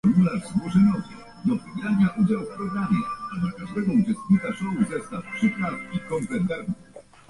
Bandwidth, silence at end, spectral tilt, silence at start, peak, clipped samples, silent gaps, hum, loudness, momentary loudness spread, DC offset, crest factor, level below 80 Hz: 11.5 kHz; 0.3 s; -8 dB/octave; 0.05 s; -8 dBFS; under 0.1%; none; none; -25 LUFS; 11 LU; under 0.1%; 16 dB; -54 dBFS